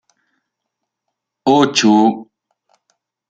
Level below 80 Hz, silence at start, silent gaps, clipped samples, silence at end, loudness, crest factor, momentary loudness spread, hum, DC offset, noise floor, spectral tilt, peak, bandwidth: -62 dBFS; 1.45 s; none; under 0.1%; 1.05 s; -13 LUFS; 18 dB; 10 LU; none; under 0.1%; -78 dBFS; -4.5 dB/octave; 0 dBFS; 9.2 kHz